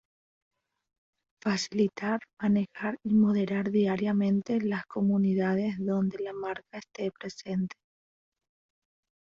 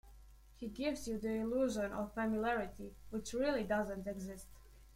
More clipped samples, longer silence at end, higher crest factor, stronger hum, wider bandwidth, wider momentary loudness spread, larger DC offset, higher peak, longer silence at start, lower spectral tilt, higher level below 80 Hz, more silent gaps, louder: neither; first, 1.6 s vs 0 s; about the same, 16 dB vs 16 dB; neither; second, 7.6 kHz vs 16.5 kHz; second, 10 LU vs 13 LU; neither; first, -14 dBFS vs -24 dBFS; first, 1.45 s vs 0.05 s; first, -7 dB/octave vs -5 dB/octave; second, -68 dBFS vs -58 dBFS; first, 2.33-2.37 s vs none; first, -29 LUFS vs -39 LUFS